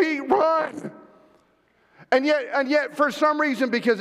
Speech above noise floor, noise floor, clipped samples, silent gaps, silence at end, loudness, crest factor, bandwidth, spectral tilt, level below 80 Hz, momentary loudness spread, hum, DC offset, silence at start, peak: 41 dB; -63 dBFS; under 0.1%; none; 0 s; -22 LUFS; 14 dB; 14.5 kHz; -4.5 dB/octave; -72 dBFS; 6 LU; none; under 0.1%; 0 s; -8 dBFS